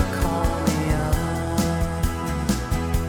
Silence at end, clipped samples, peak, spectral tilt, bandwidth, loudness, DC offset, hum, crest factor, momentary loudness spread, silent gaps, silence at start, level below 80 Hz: 0 s; under 0.1%; -6 dBFS; -6 dB/octave; 18.5 kHz; -24 LUFS; under 0.1%; none; 16 dB; 3 LU; none; 0 s; -28 dBFS